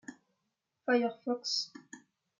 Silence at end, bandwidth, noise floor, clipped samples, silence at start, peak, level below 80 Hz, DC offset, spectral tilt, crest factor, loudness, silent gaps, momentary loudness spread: 0.45 s; 9 kHz; -84 dBFS; under 0.1%; 0.1 s; -16 dBFS; under -90 dBFS; under 0.1%; -2.5 dB/octave; 22 dB; -33 LUFS; none; 23 LU